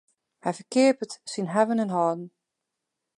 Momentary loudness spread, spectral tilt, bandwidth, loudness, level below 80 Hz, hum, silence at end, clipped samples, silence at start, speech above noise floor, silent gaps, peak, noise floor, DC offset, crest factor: 12 LU; -5.5 dB/octave; 11.5 kHz; -26 LUFS; -80 dBFS; none; 0.9 s; under 0.1%; 0.45 s; 59 dB; none; -8 dBFS; -84 dBFS; under 0.1%; 20 dB